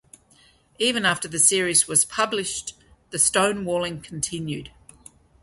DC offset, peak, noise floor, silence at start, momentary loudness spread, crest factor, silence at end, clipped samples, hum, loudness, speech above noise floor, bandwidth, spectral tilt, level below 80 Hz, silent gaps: under 0.1%; -2 dBFS; -57 dBFS; 0.8 s; 14 LU; 22 dB; 0.75 s; under 0.1%; none; -21 LUFS; 34 dB; 12 kHz; -2 dB/octave; -56 dBFS; none